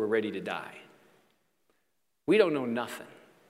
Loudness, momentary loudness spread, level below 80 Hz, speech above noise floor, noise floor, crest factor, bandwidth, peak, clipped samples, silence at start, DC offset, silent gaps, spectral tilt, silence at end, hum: -30 LUFS; 20 LU; -78 dBFS; 51 dB; -80 dBFS; 24 dB; 15.5 kHz; -8 dBFS; under 0.1%; 0 s; under 0.1%; none; -5.5 dB/octave; 0.35 s; none